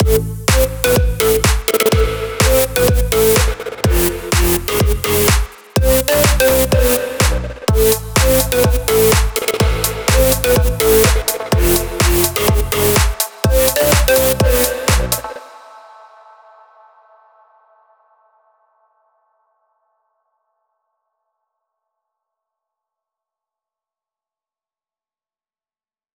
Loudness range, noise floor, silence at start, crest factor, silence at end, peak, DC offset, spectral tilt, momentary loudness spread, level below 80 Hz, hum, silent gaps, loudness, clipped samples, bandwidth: 2 LU; under -90 dBFS; 0 s; 16 dB; 10.35 s; 0 dBFS; under 0.1%; -4 dB/octave; 5 LU; -22 dBFS; none; none; -14 LUFS; under 0.1%; over 20 kHz